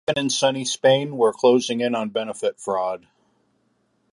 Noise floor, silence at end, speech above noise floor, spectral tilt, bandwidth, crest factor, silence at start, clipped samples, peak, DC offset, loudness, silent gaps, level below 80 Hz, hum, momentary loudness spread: -67 dBFS; 1.15 s; 46 dB; -4 dB/octave; 11.5 kHz; 18 dB; 0.1 s; under 0.1%; -4 dBFS; under 0.1%; -21 LUFS; none; -68 dBFS; none; 8 LU